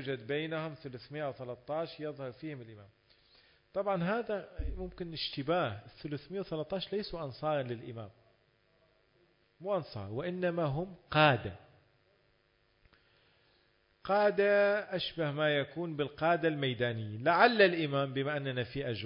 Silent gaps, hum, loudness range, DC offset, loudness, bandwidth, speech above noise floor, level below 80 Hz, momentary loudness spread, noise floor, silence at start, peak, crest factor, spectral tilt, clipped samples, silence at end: none; none; 10 LU; under 0.1%; -33 LUFS; 5.4 kHz; 39 dB; -56 dBFS; 16 LU; -72 dBFS; 0 s; -10 dBFS; 24 dB; -3.5 dB/octave; under 0.1%; 0 s